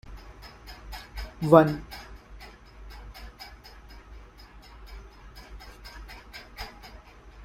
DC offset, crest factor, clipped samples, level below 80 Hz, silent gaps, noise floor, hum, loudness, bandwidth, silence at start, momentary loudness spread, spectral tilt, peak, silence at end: under 0.1%; 28 dB; under 0.1%; -46 dBFS; none; -49 dBFS; none; -22 LUFS; 16 kHz; 0.05 s; 26 LU; -7.5 dB/octave; -2 dBFS; 0 s